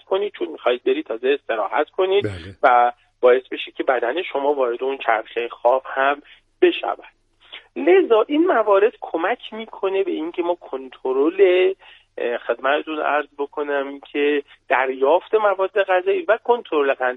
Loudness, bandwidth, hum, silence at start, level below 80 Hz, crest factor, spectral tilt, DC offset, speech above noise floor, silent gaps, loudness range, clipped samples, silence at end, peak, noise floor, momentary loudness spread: -20 LUFS; 4.6 kHz; none; 0.1 s; -64 dBFS; 18 dB; -6.5 dB/octave; under 0.1%; 24 dB; none; 2 LU; under 0.1%; 0 s; -2 dBFS; -44 dBFS; 12 LU